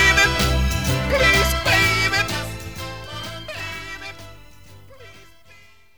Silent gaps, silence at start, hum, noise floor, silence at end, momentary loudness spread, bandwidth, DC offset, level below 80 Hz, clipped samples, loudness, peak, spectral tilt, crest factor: none; 0 s; none; -51 dBFS; 0.8 s; 17 LU; over 20 kHz; 0.6%; -30 dBFS; under 0.1%; -18 LUFS; -4 dBFS; -3.5 dB/octave; 18 dB